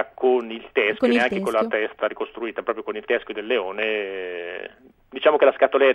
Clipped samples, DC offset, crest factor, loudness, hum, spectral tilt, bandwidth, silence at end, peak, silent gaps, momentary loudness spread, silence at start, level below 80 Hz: under 0.1%; under 0.1%; 18 dB; -22 LUFS; none; -5 dB/octave; 12.5 kHz; 0 s; -4 dBFS; none; 13 LU; 0 s; -62 dBFS